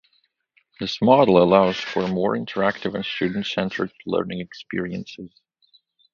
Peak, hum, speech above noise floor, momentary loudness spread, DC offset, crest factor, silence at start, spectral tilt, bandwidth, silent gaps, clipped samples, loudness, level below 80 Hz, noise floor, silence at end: 0 dBFS; none; 46 dB; 16 LU; under 0.1%; 22 dB; 0.8 s; -6.5 dB/octave; 7.2 kHz; none; under 0.1%; -21 LUFS; -56 dBFS; -67 dBFS; 0.85 s